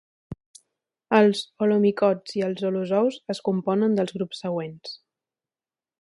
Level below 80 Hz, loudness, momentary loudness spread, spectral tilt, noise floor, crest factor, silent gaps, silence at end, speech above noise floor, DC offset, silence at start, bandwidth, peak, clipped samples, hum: -64 dBFS; -24 LUFS; 21 LU; -6.5 dB/octave; under -90 dBFS; 20 dB; 0.46-0.54 s; 1.05 s; over 67 dB; under 0.1%; 0.3 s; 11.5 kHz; -4 dBFS; under 0.1%; none